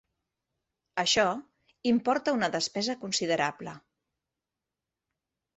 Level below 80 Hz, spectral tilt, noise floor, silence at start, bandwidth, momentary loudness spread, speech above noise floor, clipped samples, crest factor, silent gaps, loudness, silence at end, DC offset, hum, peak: -70 dBFS; -3 dB/octave; -89 dBFS; 0.95 s; 8.4 kHz; 12 LU; 60 dB; under 0.1%; 20 dB; none; -28 LUFS; 1.8 s; under 0.1%; none; -12 dBFS